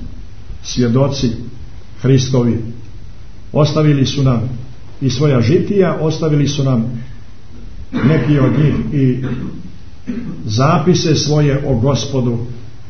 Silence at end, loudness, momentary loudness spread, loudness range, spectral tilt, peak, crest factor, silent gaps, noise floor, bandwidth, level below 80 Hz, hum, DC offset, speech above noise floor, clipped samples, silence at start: 0 s; -15 LUFS; 17 LU; 2 LU; -6.5 dB/octave; 0 dBFS; 14 dB; none; -36 dBFS; 6.6 kHz; -34 dBFS; none; 5%; 22 dB; under 0.1%; 0 s